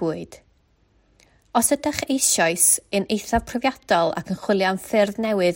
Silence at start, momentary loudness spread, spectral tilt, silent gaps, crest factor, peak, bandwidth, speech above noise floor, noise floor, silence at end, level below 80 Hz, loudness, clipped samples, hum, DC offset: 0 s; 9 LU; -3 dB/octave; none; 20 dB; -2 dBFS; 16.5 kHz; 40 dB; -61 dBFS; 0 s; -48 dBFS; -21 LUFS; under 0.1%; none; under 0.1%